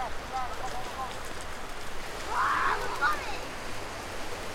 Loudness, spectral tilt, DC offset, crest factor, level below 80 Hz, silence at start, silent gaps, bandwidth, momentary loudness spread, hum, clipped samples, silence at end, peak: -33 LUFS; -3 dB/octave; under 0.1%; 18 dB; -44 dBFS; 0 s; none; 16 kHz; 11 LU; none; under 0.1%; 0 s; -14 dBFS